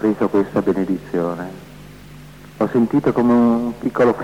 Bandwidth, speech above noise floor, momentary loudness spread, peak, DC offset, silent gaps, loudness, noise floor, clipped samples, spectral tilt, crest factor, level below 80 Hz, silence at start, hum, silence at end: 13.5 kHz; 22 dB; 10 LU; -6 dBFS; 0.2%; none; -18 LUFS; -39 dBFS; under 0.1%; -8.5 dB/octave; 12 dB; -48 dBFS; 0 s; none; 0 s